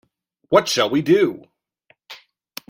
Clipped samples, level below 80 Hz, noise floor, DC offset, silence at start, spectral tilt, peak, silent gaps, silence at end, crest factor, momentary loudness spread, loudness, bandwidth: under 0.1%; -64 dBFS; -61 dBFS; under 0.1%; 0.5 s; -4.5 dB/octave; 0 dBFS; none; 0.55 s; 20 dB; 18 LU; -18 LUFS; 16.5 kHz